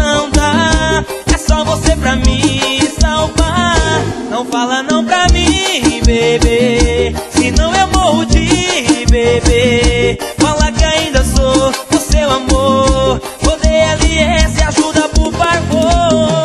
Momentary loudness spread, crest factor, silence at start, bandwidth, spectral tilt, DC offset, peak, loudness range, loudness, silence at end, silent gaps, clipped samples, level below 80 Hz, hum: 4 LU; 10 dB; 0 s; 12.5 kHz; -4.5 dB/octave; under 0.1%; 0 dBFS; 1 LU; -12 LUFS; 0 s; none; under 0.1%; -16 dBFS; none